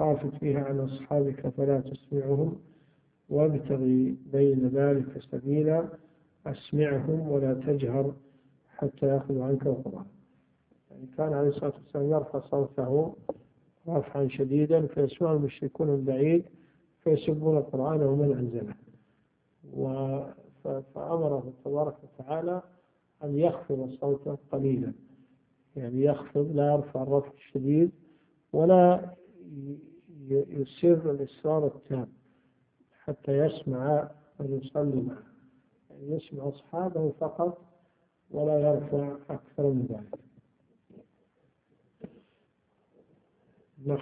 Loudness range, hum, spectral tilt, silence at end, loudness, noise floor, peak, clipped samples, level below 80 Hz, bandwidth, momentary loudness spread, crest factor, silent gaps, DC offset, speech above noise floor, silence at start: 7 LU; none; -12.5 dB/octave; 0 s; -29 LUFS; -71 dBFS; -8 dBFS; under 0.1%; -66 dBFS; 4.5 kHz; 16 LU; 22 dB; none; under 0.1%; 44 dB; 0 s